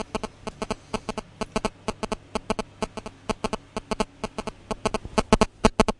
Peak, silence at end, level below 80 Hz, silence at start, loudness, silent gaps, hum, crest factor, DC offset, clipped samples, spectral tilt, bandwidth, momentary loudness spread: -4 dBFS; 0.05 s; -38 dBFS; 0 s; -29 LUFS; none; none; 24 dB; under 0.1%; under 0.1%; -4.5 dB/octave; 11.5 kHz; 12 LU